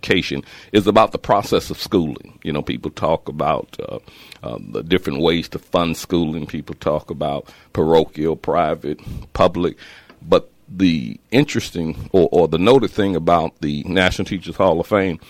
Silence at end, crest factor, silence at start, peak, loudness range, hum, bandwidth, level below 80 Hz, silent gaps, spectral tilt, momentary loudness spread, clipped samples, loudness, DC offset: 0.1 s; 18 dB; 0.05 s; -2 dBFS; 5 LU; none; 16.5 kHz; -42 dBFS; none; -6 dB/octave; 13 LU; under 0.1%; -19 LUFS; under 0.1%